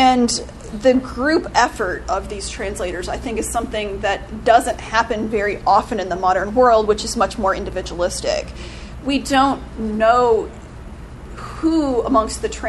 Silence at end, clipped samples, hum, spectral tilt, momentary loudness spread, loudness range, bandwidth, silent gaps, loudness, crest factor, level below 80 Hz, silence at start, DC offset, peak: 0 s; under 0.1%; none; -4 dB/octave; 16 LU; 4 LU; 12.5 kHz; none; -19 LUFS; 18 dB; -36 dBFS; 0 s; under 0.1%; 0 dBFS